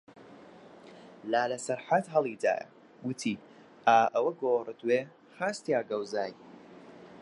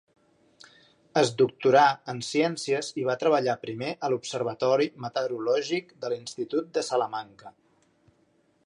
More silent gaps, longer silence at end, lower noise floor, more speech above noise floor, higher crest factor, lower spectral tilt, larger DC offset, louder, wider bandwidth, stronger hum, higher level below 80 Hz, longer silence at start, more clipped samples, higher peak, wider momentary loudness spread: neither; second, 0 s vs 1.15 s; second, -52 dBFS vs -67 dBFS; second, 23 dB vs 40 dB; about the same, 22 dB vs 20 dB; about the same, -4.5 dB/octave vs -4.5 dB/octave; neither; second, -30 LUFS vs -27 LUFS; about the same, 11.5 kHz vs 11.5 kHz; neither; second, -82 dBFS vs -76 dBFS; second, 0.15 s vs 1.15 s; neither; about the same, -10 dBFS vs -8 dBFS; first, 26 LU vs 12 LU